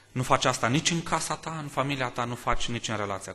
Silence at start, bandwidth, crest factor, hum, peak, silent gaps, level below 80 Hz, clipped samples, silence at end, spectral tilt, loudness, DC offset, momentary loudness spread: 0.15 s; 13 kHz; 22 dB; none; -6 dBFS; none; -44 dBFS; under 0.1%; 0 s; -4 dB/octave; -28 LUFS; under 0.1%; 7 LU